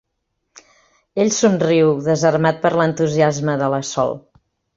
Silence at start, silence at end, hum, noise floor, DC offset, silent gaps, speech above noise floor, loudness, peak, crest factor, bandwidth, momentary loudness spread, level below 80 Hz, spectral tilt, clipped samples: 1.15 s; 0.55 s; none; -73 dBFS; under 0.1%; none; 57 dB; -17 LUFS; -2 dBFS; 16 dB; 7.8 kHz; 6 LU; -56 dBFS; -5.5 dB/octave; under 0.1%